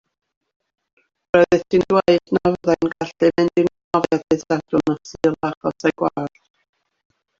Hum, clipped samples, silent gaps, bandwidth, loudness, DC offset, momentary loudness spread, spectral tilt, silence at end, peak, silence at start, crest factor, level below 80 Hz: none; under 0.1%; 3.84-3.91 s, 5.57-5.61 s; 7.6 kHz; -19 LUFS; under 0.1%; 8 LU; -6.5 dB/octave; 1.1 s; -2 dBFS; 1.35 s; 18 dB; -54 dBFS